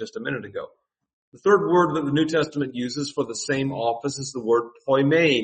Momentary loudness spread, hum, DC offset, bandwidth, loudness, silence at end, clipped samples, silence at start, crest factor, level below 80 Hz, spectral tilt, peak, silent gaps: 12 LU; none; under 0.1%; 8.8 kHz; -23 LUFS; 0 s; under 0.1%; 0 s; 18 dB; -62 dBFS; -5 dB/octave; -6 dBFS; 1.13-1.32 s